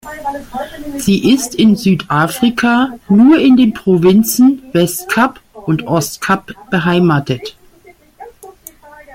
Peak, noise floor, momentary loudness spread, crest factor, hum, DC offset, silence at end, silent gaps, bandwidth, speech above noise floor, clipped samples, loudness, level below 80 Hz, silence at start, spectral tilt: 0 dBFS; -45 dBFS; 14 LU; 12 dB; none; under 0.1%; 0 s; none; 17 kHz; 33 dB; under 0.1%; -12 LUFS; -46 dBFS; 0.05 s; -5.5 dB/octave